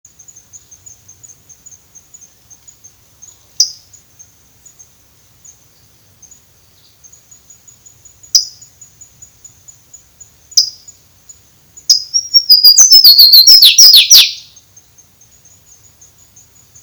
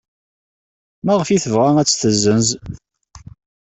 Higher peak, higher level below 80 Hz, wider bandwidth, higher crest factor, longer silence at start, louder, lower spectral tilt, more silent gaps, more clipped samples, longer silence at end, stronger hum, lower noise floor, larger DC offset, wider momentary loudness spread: about the same, 0 dBFS vs -2 dBFS; second, -58 dBFS vs -48 dBFS; first, over 20 kHz vs 8.4 kHz; about the same, 14 dB vs 16 dB; first, 3.6 s vs 1.05 s; first, -4 LUFS vs -16 LUFS; second, 4.5 dB/octave vs -4.5 dB/octave; neither; first, 3% vs under 0.1%; first, 2.45 s vs 0.45 s; neither; first, -48 dBFS vs -41 dBFS; neither; about the same, 14 LU vs 14 LU